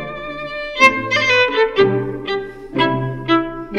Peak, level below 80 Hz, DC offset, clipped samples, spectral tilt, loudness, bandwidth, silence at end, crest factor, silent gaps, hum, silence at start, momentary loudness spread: 0 dBFS; -44 dBFS; under 0.1%; under 0.1%; -5 dB/octave; -16 LUFS; 12 kHz; 0 s; 18 dB; none; none; 0 s; 13 LU